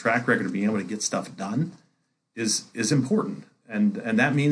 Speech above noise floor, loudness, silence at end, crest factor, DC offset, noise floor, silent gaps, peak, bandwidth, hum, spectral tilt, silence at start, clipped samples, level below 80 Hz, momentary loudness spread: 47 dB; -25 LUFS; 0 s; 18 dB; under 0.1%; -72 dBFS; none; -6 dBFS; 10.5 kHz; none; -4.5 dB/octave; 0 s; under 0.1%; -74 dBFS; 11 LU